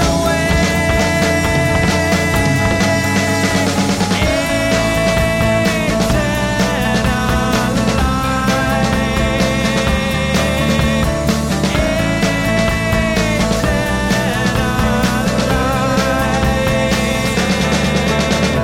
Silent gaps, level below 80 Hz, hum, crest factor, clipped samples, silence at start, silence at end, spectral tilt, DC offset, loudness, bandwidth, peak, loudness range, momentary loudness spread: none; -24 dBFS; none; 10 dB; under 0.1%; 0 s; 0 s; -5 dB/octave; under 0.1%; -15 LUFS; 16.5 kHz; -4 dBFS; 1 LU; 2 LU